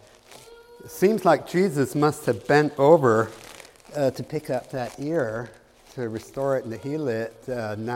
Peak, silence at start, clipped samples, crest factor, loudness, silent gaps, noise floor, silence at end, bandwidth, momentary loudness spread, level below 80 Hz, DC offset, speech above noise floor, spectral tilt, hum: -4 dBFS; 0.3 s; under 0.1%; 22 dB; -24 LUFS; none; -49 dBFS; 0 s; 16.5 kHz; 16 LU; -60 dBFS; under 0.1%; 26 dB; -6.5 dB/octave; none